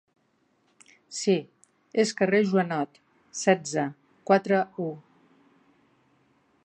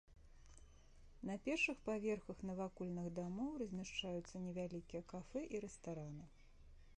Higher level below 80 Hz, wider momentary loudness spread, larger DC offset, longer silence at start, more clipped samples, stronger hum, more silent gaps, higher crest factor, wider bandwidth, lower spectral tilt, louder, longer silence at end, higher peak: second, -78 dBFS vs -66 dBFS; about the same, 14 LU vs 14 LU; neither; first, 1.1 s vs 0.1 s; neither; neither; neither; about the same, 22 dB vs 18 dB; about the same, 9.8 kHz vs 10 kHz; about the same, -5 dB/octave vs -5.5 dB/octave; first, -26 LUFS vs -46 LUFS; first, 1.65 s vs 0 s; first, -6 dBFS vs -28 dBFS